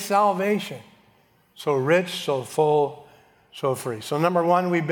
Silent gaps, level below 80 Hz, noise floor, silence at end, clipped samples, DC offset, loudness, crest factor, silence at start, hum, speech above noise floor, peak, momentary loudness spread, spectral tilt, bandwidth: none; -74 dBFS; -60 dBFS; 0 s; under 0.1%; under 0.1%; -23 LUFS; 18 dB; 0 s; none; 38 dB; -6 dBFS; 9 LU; -5.5 dB/octave; 19.5 kHz